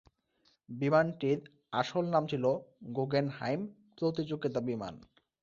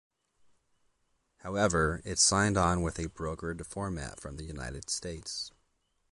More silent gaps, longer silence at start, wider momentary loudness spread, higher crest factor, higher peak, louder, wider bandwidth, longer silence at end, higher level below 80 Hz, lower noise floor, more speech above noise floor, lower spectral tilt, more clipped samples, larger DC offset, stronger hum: neither; second, 0.7 s vs 1.45 s; second, 10 LU vs 16 LU; about the same, 20 dB vs 20 dB; about the same, -14 dBFS vs -12 dBFS; about the same, -33 LUFS vs -31 LUFS; second, 7.4 kHz vs 11.5 kHz; second, 0.45 s vs 0.65 s; second, -70 dBFS vs -46 dBFS; about the same, -73 dBFS vs -75 dBFS; second, 40 dB vs 44 dB; first, -7.5 dB/octave vs -3.5 dB/octave; neither; neither; neither